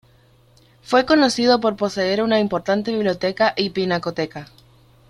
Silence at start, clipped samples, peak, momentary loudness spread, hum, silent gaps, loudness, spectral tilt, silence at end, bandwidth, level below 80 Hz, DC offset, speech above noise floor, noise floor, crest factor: 0.9 s; under 0.1%; -2 dBFS; 8 LU; none; none; -19 LUFS; -5 dB/octave; 0.65 s; 13 kHz; -56 dBFS; under 0.1%; 35 dB; -54 dBFS; 18 dB